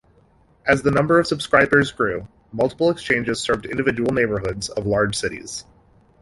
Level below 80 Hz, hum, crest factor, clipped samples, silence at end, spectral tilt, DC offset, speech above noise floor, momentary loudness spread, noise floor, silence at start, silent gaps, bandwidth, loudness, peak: -46 dBFS; none; 20 dB; under 0.1%; 0.6 s; -5 dB/octave; under 0.1%; 36 dB; 10 LU; -56 dBFS; 0.65 s; none; 11.5 kHz; -20 LUFS; -2 dBFS